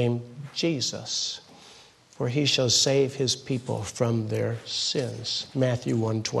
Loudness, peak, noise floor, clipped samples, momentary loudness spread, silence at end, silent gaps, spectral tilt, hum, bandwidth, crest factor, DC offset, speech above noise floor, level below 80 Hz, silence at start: -26 LUFS; -8 dBFS; -52 dBFS; under 0.1%; 10 LU; 0 s; none; -4 dB/octave; none; 12.5 kHz; 18 dB; under 0.1%; 26 dB; -64 dBFS; 0 s